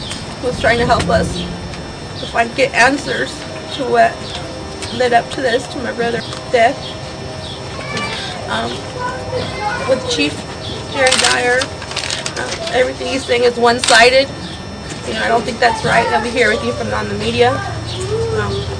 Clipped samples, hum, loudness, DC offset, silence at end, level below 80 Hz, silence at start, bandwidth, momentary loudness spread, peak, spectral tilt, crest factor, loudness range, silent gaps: under 0.1%; none; -16 LUFS; under 0.1%; 0 s; -36 dBFS; 0 s; 10.5 kHz; 14 LU; 0 dBFS; -3.5 dB/octave; 16 dB; 6 LU; none